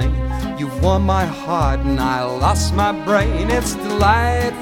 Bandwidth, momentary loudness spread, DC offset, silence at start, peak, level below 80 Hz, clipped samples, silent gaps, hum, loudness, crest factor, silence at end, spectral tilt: 17 kHz; 6 LU; under 0.1%; 0 s; -2 dBFS; -24 dBFS; under 0.1%; none; none; -18 LUFS; 16 dB; 0 s; -5.5 dB/octave